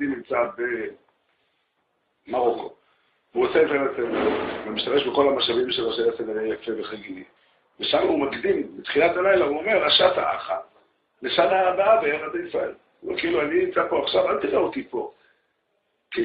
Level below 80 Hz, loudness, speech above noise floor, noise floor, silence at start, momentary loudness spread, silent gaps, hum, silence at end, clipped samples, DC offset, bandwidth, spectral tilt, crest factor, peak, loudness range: -60 dBFS; -23 LUFS; 49 dB; -72 dBFS; 0 s; 13 LU; none; none; 0 s; under 0.1%; under 0.1%; 5.2 kHz; -8.5 dB/octave; 20 dB; -4 dBFS; 5 LU